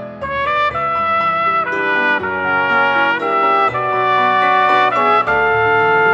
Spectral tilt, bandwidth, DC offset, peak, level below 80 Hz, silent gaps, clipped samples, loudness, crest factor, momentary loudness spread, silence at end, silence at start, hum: -5.5 dB/octave; 8 kHz; under 0.1%; -2 dBFS; -48 dBFS; none; under 0.1%; -14 LUFS; 14 dB; 4 LU; 0 s; 0 s; none